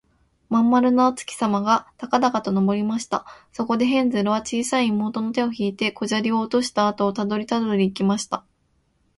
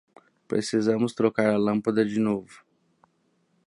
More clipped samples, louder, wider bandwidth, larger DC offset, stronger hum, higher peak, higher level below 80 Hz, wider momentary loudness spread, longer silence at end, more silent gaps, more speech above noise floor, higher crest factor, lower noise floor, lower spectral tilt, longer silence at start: neither; first, -22 LUFS vs -25 LUFS; about the same, 11.5 kHz vs 11 kHz; neither; neither; first, -4 dBFS vs -8 dBFS; first, -60 dBFS vs -68 dBFS; about the same, 7 LU vs 6 LU; second, 0.8 s vs 1.1 s; neither; about the same, 45 dB vs 45 dB; about the same, 18 dB vs 18 dB; about the same, -66 dBFS vs -69 dBFS; about the same, -5 dB/octave vs -6 dB/octave; about the same, 0.5 s vs 0.5 s